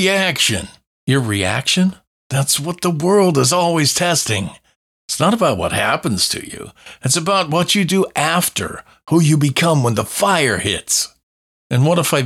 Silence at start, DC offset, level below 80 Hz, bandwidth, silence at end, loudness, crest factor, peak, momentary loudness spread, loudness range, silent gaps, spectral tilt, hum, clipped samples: 0 s; under 0.1%; -50 dBFS; 16.5 kHz; 0 s; -16 LUFS; 14 dB; -2 dBFS; 10 LU; 2 LU; 0.87-1.07 s, 2.07-2.30 s, 4.76-5.08 s, 11.23-11.70 s; -4 dB/octave; none; under 0.1%